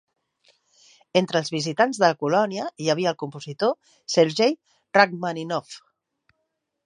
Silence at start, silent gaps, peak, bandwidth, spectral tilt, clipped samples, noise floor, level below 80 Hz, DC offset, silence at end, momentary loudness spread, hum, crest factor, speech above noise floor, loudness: 1.15 s; none; -2 dBFS; 10.5 kHz; -4.5 dB/octave; under 0.1%; -78 dBFS; -76 dBFS; under 0.1%; 1.05 s; 14 LU; none; 22 dB; 55 dB; -23 LUFS